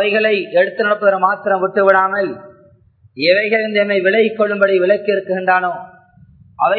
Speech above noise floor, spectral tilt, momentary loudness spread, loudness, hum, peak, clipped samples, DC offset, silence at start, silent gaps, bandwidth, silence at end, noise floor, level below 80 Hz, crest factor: 35 dB; -8 dB/octave; 6 LU; -15 LUFS; none; 0 dBFS; under 0.1%; under 0.1%; 0 s; none; 4.6 kHz; 0 s; -50 dBFS; -64 dBFS; 16 dB